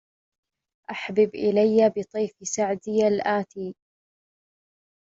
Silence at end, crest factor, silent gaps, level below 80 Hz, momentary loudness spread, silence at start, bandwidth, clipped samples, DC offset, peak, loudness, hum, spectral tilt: 1.35 s; 18 dB; none; -68 dBFS; 16 LU; 0.9 s; 7.8 kHz; under 0.1%; under 0.1%; -8 dBFS; -23 LUFS; none; -5 dB/octave